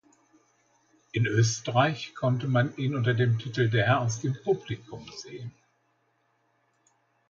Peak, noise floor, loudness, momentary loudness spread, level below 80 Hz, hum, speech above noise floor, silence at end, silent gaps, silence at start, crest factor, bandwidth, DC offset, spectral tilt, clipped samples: -10 dBFS; -71 dBFS; -27 LUFS; 17 LU; -62 dBFS; none; 45 dB; 1.8 s; none; 1.15 s; 20 dB; 7.6 kHz; under 0.1%; -5.5 dB/octave; under 0.1%